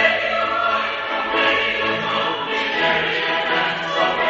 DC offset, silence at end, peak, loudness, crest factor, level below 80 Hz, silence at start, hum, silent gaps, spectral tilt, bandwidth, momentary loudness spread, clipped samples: under 0.1%; 0 s; -2 dBFS; -19 LUFS; 18 dB; -54 dBFS; 0 s; none; none; -3.5 dB/octave; 8 kHz; 4 LU; under 0.1%